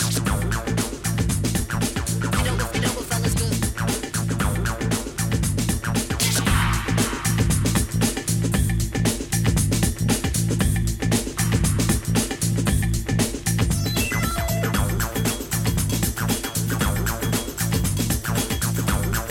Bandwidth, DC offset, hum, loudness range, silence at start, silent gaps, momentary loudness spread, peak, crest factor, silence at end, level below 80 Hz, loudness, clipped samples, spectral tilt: 17 kHz; under 0.1%; none; 2 LU; 0 s; none; 4 LU; -6 dBFS; 16 dB; 0 s; -30 dBFS; -23 LUFS; under 0.1%; -4.5 dB/octave